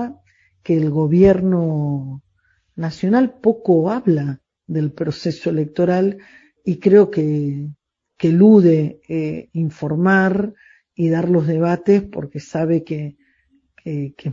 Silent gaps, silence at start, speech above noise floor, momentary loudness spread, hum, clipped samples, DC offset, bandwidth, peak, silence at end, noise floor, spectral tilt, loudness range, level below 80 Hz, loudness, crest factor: none; 0 s; 46 dB; 16 LU; none; under 0.1%; under 0.1%; 7.6 kHz; 0 dBFS; 0 s; -63 dBFS; -9 dB/octave; 4 LU; -50 dBFS; -18 LUFS; 18 dB